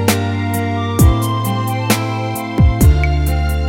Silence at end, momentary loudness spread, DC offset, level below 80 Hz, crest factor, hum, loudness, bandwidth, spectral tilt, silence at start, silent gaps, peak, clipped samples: 0 s; 6 LU; under 0.1%; -18 dBFS; 14 dB; none; -15 LUFS; 18.5 kHz; -5.5 dB/octave; 0 s; none; 0 dBFS; under 0.1%